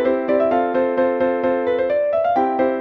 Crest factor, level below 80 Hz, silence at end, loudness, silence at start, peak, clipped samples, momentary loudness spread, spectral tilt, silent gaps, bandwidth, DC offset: 12 dB; -56 dBFS; 0 s; -19 LUFS; 0 s; -6 dBFS; under 0.1%; 2 LU; -8 dB/octave; none; 5.2 kHz; under 0.1%